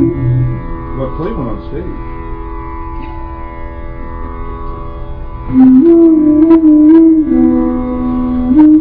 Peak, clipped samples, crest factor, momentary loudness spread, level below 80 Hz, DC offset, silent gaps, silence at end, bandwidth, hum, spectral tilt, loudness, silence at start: 0 dBFS; 0.3%; 10 dB; 21 LU; -24 dBFS; under 0.1%; none; 0 s; 3.8 kHz; none; -13 dB/octave; -9 LUFS; 0 s